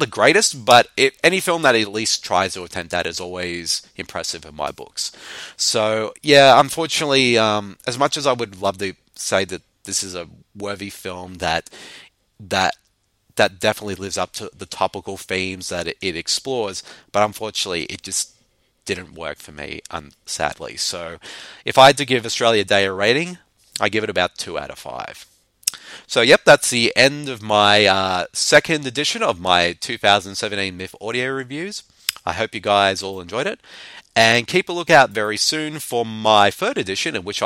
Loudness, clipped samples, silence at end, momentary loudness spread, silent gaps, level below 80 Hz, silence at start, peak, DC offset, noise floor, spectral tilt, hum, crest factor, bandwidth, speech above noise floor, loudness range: -18 LUFS; under 0.1%; 0 s; 18 LU; none; -54 dBFS; 0 s; 0 dBFS; under 0.1%; -62 dBFS; -2.5 dB/octave; none; 20 dB; 16.5 kHz; 43 dB; 9 LU